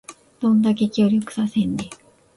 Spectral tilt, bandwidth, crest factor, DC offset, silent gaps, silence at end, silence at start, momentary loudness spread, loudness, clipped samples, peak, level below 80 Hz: -6.5 dB/octave; 11.5 kHz; 14 dB; under 0.1%; none; 0.45 s; 0.1 s; 9 LU; -20 LUFS; under 0.1%; -8 dBFS; -56 dBFS